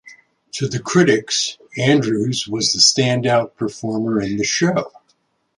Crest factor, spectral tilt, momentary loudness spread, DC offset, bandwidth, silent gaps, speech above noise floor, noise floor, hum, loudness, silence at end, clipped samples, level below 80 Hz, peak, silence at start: 18 dB; -3.5 dB/octave; 12 LU; under 0.1%; 11.5 kHz; none; 46 dB; -64 dBFS; none; -17 LUFS; 0.7 s; under 0.1%; -56 dBFS; 0 dBFS; 0.05 s